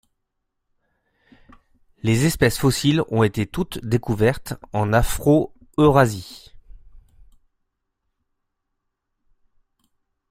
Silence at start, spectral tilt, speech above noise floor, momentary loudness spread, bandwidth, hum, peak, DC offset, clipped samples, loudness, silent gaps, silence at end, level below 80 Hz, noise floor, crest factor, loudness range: 2.05 s; -6 dB/octave; 58 dB; 11 LU; 16 kHz; none; -2 dBFS; under 0.1%; under 0.1%; -20 LUFS; none; 3.3 s; -38 dBFS; -77 dBFS; 22 dB; 4 LU